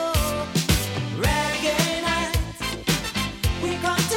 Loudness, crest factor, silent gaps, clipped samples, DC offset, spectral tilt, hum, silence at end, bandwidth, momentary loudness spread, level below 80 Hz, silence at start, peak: -24 LUFS; 18 dB; none; under 0.1%; under 0.1%; -4 dB/octave; none; 0 s; 17 kHz; 5 LU; -34 dBFS; 0 s; -6 dBFS